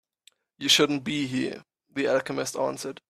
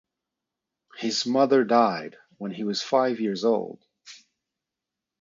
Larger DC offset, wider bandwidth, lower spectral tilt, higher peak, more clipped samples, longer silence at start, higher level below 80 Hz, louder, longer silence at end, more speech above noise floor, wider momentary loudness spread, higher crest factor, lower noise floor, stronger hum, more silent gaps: neither; first, 15 kHz vs 7.6 kHz; second, -3 dB/octave vs -4.5 dB/octave; about the same, -6 dBFS vs -6 dBFS; neither; second, 0.6 s vs 0.95 s; first, -68 dBFS vs -76 dBFS; about the same, -26 LUFS vs -24 LUFS; second, 0.2 s vs 1.05 s; second, 37 dB vs 63 dB; about the same, 15 LU vs 16 LU; about the same, 22 dB vs 20 dB; second, -63 dBFS vs -87 dBFS; neither; neither